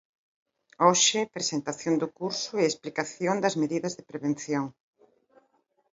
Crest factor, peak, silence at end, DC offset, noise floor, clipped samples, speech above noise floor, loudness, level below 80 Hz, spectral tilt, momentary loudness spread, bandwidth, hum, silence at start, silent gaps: 22 dB; -6 dBFS; 1.25 s; under 0.1%; -70 dBFS; under 0.1%; 43 dB; -27 LUFS; -74 dBFS; -3 dB/octave; 10 LU; 7.8 kHz; none; 0.8 s; none